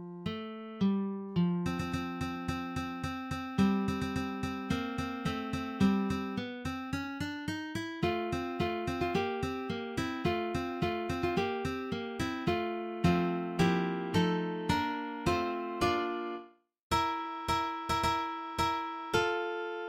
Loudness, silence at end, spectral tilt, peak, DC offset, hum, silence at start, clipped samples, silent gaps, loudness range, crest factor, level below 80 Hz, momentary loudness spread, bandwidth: -33 LUFS; 0 s; -6 dB/octave; -16 dBFS; under 0.1%; none; 0 s; under 0.1%; 16.83-16.90 s; 3 LU; 18 dB; -54 dBFS; 8 LU; 16 kHz